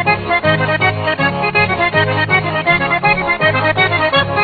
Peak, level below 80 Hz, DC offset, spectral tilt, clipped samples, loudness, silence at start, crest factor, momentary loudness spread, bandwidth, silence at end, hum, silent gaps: 0 dBFS; -40 dBFS; under 0.1%; -8 dB/octave; under 0.1%; -13 LUFS; 0 s; 14 dB; 1 LU; 4.8 kHz; 0 s; none; none